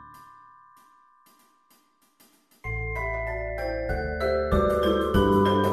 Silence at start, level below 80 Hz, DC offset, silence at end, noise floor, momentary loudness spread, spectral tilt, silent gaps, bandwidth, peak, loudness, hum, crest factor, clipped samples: 0 s; -38 dBFS; under 0.1%; 0 s; -63 dBFS; 11 LU; -7 dB/octave; none; 13.5 kHz; -8 dBFS; -25 LUFS; none; 18 dB; under 0.1%